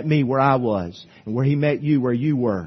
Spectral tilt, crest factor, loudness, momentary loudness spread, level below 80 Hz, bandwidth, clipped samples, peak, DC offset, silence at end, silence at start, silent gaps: -9.5 dB/octave; 16 dB; -20 LUFS; 10 LU; -58 dBFS; 6.2 kHz; under 0.1%; -4 dBFS; under 0.1%; 0 s; 0 s; none